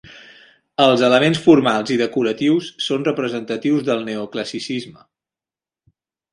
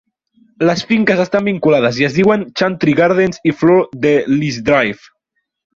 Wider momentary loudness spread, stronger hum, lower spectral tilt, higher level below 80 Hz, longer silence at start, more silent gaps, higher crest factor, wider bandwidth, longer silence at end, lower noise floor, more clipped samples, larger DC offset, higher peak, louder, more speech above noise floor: first, 13 LU vs 4 LU; neither; about the same, -5.5 dB/octave vs -6.5 dB/octave; second, -62 dBFS vs -50 dBFS; second, 0.15 s vs 0.6 s; neither; first, 20 dB vs 14 dB; first, 11.5 kHz vs 7.6 kHz; first, 1.4 s vs 0.8 s; first, under -90 dBFS vs -71 dBFS; neither; neither; about the same, 0 dBFS vs 0 dBFS; second, -18 LUFS vs -14 LUFS; first, over 73 dB vs 58 dB